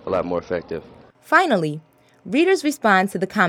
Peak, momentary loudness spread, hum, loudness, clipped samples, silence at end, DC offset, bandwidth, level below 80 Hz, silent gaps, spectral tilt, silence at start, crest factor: -2 dBFS; 13 LU; none; -20 LUFS; under 0.1%; 0 s; under 0.1%; 17.5 kHz; -58 dBFS; none; -5 dB/octave; 0.05 s; 20 dB